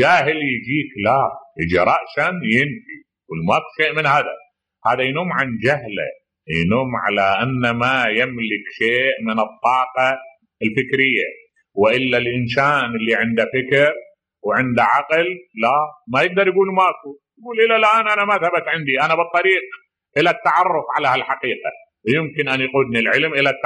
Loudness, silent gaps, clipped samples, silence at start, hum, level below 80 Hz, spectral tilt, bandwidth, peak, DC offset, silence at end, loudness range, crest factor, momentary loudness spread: -18 LUFS; none; under 0.1%; 0 s; none; -54 dBFS; -6 dB/octave; 11 kHz; -2 dBFS; under 0.1%; 0 s; 3 LU; 16 dB; 9 LU